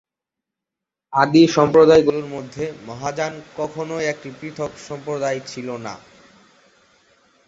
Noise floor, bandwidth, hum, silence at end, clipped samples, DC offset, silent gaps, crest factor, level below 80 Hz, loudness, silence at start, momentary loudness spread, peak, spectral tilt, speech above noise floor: -85 dBFS; 7.8 kHz; none; 1.5 s; under 0.1%; under 0.1%; none; 20 dB; -56 dBFS; -19 LUFS; 1.1 s; 18 LU; -2 dBFS; -5.5 dB/octave; 66 dB